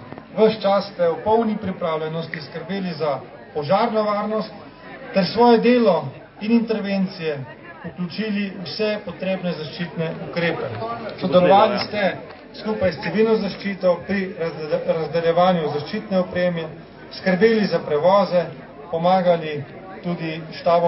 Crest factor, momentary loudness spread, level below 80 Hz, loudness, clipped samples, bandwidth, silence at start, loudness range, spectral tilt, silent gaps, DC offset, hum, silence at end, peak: 18 dB; 15 LU; -56 dBFS; -21 LUFS; under 0.1%; 5.8 kHz; 0 s; 5 LU; -10 dB/octave; none; under 0.1%; none; 0 s; -2 dBFS